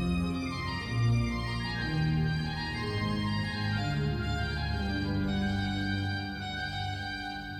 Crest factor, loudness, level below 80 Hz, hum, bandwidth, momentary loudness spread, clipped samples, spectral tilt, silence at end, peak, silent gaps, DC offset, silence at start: 14 dB; -32 LUFS; -42 dBFS; none; 14.5 kHz; 6 LU; under 0.1%; -6.5 dB/octave; 0 s; -18 dBFS; none; under 0.1%; 0 s